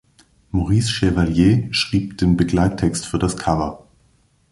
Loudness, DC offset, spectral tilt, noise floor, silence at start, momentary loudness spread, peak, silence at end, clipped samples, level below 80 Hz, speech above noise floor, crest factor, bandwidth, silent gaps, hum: -19 LUFS; under 0.1%; -6 dB/octave; -58 dBFS; 0.55 s; 7 LU; -4 dBFS; 0.75 s; under 0.1%; -34 dBFS; 41 dB; 16 dB; 11.5 kHz; none; none